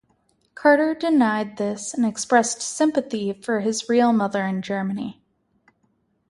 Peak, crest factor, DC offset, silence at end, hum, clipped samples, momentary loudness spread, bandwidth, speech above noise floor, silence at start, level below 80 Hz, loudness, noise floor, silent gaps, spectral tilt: -2 dBFS; 20 dB; under 0.1%; 1.2 s; none; under 0.1%; 9 LU; 11.5 kHz; 46 dB; 0.55 s; -68 dBFS; -22 LUFS; -67 dBFS; none; -4.5 dB/octave